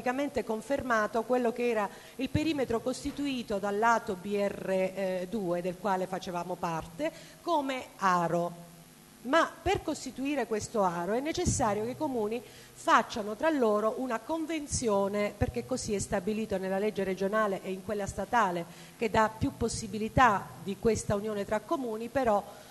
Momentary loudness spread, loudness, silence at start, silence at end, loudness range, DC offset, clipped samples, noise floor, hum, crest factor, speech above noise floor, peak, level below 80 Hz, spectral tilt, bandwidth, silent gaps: 9 LU; -31 LUFS; 0 s; 0 s; 3 LU; under 0.1%; under 0.1%; -54 dBFS; none; 22 dB; 23 dB; -8 dBFS; -52 dBFS; -5 dB/octave; 12.5 kHz; none